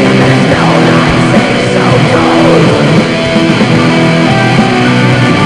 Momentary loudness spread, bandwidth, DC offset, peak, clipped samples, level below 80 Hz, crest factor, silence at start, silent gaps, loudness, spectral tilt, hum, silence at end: 2 LU; 12 kHz; 0.6%; 0 dBFS; 5%; -32 dBFS; 6 dB; 0 s; none; -7 LUFS; -6 dB/octave; none; 0 s